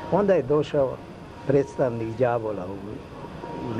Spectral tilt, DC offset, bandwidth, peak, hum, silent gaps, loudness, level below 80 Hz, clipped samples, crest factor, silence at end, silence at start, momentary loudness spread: -8 dB/octave; under 0.1%; 10.5 kHz; -8 dBFS; none; none; -25 LUFS; -50 dBFS; under 0.1%; 18 dB; 0 s; 0 s; 17 LU